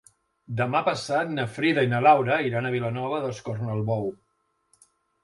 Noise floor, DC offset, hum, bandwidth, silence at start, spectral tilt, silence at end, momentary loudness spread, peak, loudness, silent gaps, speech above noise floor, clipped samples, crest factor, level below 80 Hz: -73 dBFS; under 0.1%; none; 11.5 kHz; 0.5 s; -6.5 dB/octave; 1.1 s; 11 LU; -6 dBFS; -25 LUFS; none; 48 dB; under 0.1%; 20 dB; -64 dBFS